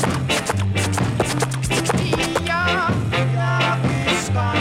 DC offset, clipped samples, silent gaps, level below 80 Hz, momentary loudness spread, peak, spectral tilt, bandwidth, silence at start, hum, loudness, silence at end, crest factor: under 0.1%; under 0.1%; none; -40 dBFS; 2 LU; -6 dBFS; -4.5 dB/octave; 15.5 kHz; 0 s; none; -20 LUFS; 0 s; 14 dB